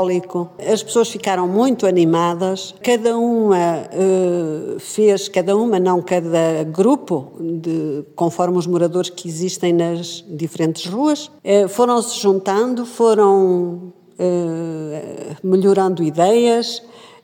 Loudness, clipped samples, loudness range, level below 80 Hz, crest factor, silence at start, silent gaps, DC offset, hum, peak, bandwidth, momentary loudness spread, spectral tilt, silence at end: -17 LUFS; under 0.1%; 3 LU; -70 dBFS; 14 dB; 0 s; none; under 0.1%; none; -2 dBFS; 17 kHz; 11 LU; -5.5 dB/octave; 0.2 s